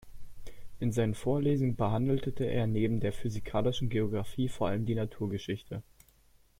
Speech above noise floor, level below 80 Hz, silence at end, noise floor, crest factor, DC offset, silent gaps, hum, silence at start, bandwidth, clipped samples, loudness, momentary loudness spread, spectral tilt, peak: 33 dB; -50 dBFS; 0.8 s; -63 dBFS; 14 dB; under 0.1%; none; none; 0.05 s; 16 kHz; under 0.1%; -32 LUFS; 8 LU; -7.5 dB/octave; -16 dBFS